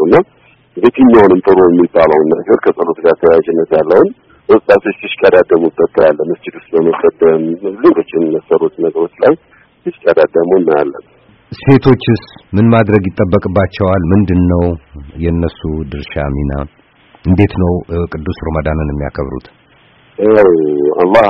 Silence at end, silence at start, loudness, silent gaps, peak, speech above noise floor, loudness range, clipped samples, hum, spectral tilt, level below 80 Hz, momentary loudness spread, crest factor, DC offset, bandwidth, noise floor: 0 s; 0 s; -11 LUFS; none; 0 dBFS; 36 dB; 7 LU; 0.2%; none; -10 dB/octave; -32 dBFS; 12 LU; 10 dB; under 0.1%; 5.8 kHz; -46 dBFS